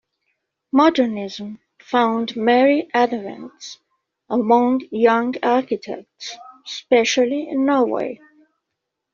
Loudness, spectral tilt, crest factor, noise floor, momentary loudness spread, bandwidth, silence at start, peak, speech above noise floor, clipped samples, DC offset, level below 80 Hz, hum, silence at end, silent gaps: -19 LUFS; -2.5 dB/octave; 18 dB; -80 dBFS; 18 LU; 7.4 kHz; 0.75 s; -2 dBFS; 61 dB; under 0.1%; under 0.1%; -66 dBFS; none; 1 s; none